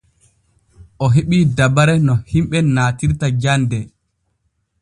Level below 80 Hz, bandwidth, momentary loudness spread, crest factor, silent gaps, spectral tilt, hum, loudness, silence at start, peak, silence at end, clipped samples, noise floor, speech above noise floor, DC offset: -38 dBFS; 11 kHz; 8 LU; 16 dB; none; -6.5 dB/octave; none; -16 LUFS; 1 s; 0 dBFS; 0.95 s; under 0.1%; -68 dBFS; 53 dB; under 0.1%